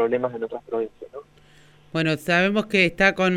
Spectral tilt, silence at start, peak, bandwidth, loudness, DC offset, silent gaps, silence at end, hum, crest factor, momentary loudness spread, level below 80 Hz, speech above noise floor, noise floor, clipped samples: -5.5 dB/octave; 0 s; -4 dBFS; 15.5 kHz; -22 LUFS; under 0.1%; none; 0 s; 50 Hz at -60 dBFS; 20 dB; 18 LU; -54 dBFS; 30 dB; -53 dBFS; under 0.1%